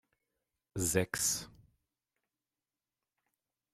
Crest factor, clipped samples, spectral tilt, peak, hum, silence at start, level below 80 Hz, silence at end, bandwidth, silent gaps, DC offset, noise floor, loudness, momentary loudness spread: 26 dB; under 0.1%; -3 dB/octave; -14 dBFS; none; 0.75 s; -64 dBFS; 2.25 s; 16 kHz; none; under 0.1%; under -90 dBFS; -33 LUFS; 15 LU